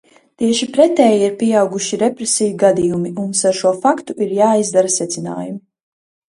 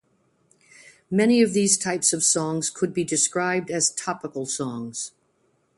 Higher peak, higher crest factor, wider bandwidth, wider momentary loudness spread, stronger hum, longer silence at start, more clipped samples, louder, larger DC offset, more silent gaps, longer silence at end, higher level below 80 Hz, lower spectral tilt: first, 0 dBFS vs -4 dBFS; about the same, 16 dB vs 20 dB; about the same, 11.5 kHz vs 11.5 kHz; second, 9 LU vs 12 LU; neither; second, 0.4 s vs 1.1 s; neither; first, -15 LUFS vs -22 LUFS; neither; neither; about the same, 0.8 s vs 0.7 s; first, -58 dBFS vs -66 dBFS; about the same, -4 dB/octave vs -3 dB/octave